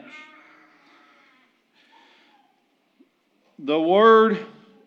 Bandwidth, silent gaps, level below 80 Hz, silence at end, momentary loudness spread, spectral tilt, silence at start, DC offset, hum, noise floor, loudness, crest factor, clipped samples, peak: 6.2 kHz; none; under -90 dBFS; 0.4 s; 28 LU; -7 dB/octave; 3.6 s; under 0.1%; none; -66 dBFS; -18 LUFS; 20 dB; under 0.1%; -4 dBFS